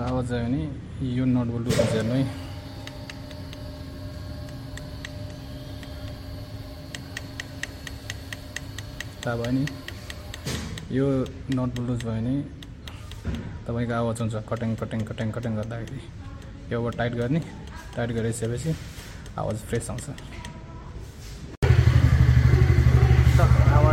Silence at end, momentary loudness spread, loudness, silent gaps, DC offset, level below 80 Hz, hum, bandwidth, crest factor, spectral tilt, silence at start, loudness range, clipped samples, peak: 0 s; 20 LU; -25 LUFS; 21.57-21.62 s; under 0.1%; -32 dBFS; none; 15 kHz; 22 dB; -7 dB/octave; 0 s; 15 LU; under 0.1%; -4 dBFS